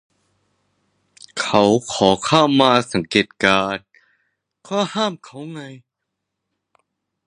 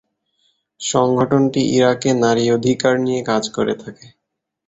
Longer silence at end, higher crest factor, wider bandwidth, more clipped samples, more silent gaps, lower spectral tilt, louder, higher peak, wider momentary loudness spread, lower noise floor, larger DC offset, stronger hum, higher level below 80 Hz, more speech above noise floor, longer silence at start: first, 1.5 s vs 0.75 s; about the same, 20 dB vs 16 dB; first, 11 kHz vs 8.2 kHz; neither; neither; about the same, -4.5 dB/octave vs -5 dB/octave; about the same, -17 LUFS vs -17 LUFS; about the same, 0 dBFS vs -2 dBFS; first, 19 LU vs 7 LU; about the same, -79 dBFS vs -78 dBFS; neither; neither; about the same, -56 dBFS vs -54 dBFS; about the same, 61 dB vs 62 dB; first, 1.35 s vs 0.8 s